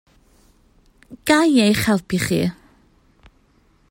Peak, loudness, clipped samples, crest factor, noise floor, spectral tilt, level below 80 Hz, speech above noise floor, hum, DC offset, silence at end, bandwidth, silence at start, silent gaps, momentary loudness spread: -2 dBFS; -18 LUFS; under 0.1%; 18 dB; -58 dBFS; -5 dB/octave; -50 dBFS; 40 dB; none; under 0.1%; 1.35 s; 16.5 kHz; 1.1 s; none; 9 LU